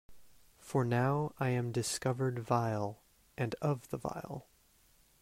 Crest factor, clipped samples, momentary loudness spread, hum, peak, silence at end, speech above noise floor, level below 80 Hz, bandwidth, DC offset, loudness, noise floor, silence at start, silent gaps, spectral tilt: 20 dB; under 0.1%; 11 LU; none; -16 dBFS; 0.8 s; 33 dB; -66 dBFS; 16 kHz; under 0.1%; -35 LUFS; -67 dBFS; 0.1 s; none; -6 dB/octave